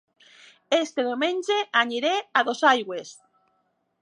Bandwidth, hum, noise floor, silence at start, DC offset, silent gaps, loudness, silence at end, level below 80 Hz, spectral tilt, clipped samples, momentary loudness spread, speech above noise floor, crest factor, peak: 11.5 kHz; none; -72 dBFS; 0.7 s; under 0.1%; none; -23 LUFS; 0.9 s; -86 dBFS; -2 dB/octave; under 0.1%; 10 LU; 48 dB; 22 dB; -4 dBFS